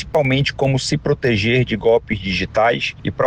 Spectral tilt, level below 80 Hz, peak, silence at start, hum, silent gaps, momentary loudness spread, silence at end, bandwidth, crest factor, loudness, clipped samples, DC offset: -5.5 dB/octave; -40 dBFS; -4 dBFS; 0 s; none; none; 4 LU; 0 s; 9.6 kHz; 12 dB; -18 LUFS; under 0.1%; under 0.1%